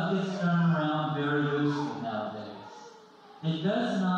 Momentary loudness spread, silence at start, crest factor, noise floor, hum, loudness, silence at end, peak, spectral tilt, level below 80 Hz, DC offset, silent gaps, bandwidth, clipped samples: 16 LU; 0 s; 14 dB; -52 dBFS; none; -29 LUFS; 0 s; -16 dBFS; -7.5 dB/octave; -72 dBFS; under 0.1%; none; 7.6 kHz; under 0.1%